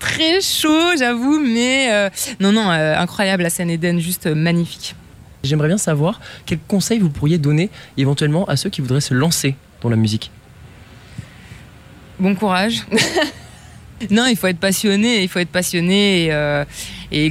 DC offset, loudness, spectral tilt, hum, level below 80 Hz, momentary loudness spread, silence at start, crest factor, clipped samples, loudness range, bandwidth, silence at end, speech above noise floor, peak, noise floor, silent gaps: under 0.1%; -17 LUFS; -4.5 dB/octave; none; -46 dBFS; 10 LU; 0 s; 16 dB; under 0.1%; 5 LU; 16 kHz; 0 s; 24 dB; -2 dBFS; -41 dBFS; none